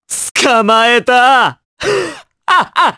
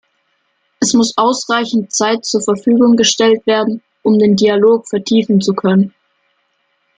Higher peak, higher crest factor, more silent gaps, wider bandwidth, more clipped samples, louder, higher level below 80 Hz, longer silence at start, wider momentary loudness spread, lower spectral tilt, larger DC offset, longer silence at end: about the same, 0 dBFS vs 0 dBFS; about the same, 12 dB vs 14 dB; first, 0.31-0.35 s, 1.65-1.77 s vs none; first, 11 kHz vs 9.4 kHz; neither; about the same, -11 LUFS vs -13 LUFS; about the same, -54 dBFS vs -58 dBFS; second, 0.1 s vs 0.8 s; first, 11 LU vs 6 LU; second, -2 dB/octave vs -4.5 dB/octave; neither; second, 0.05 s vs 1.1 s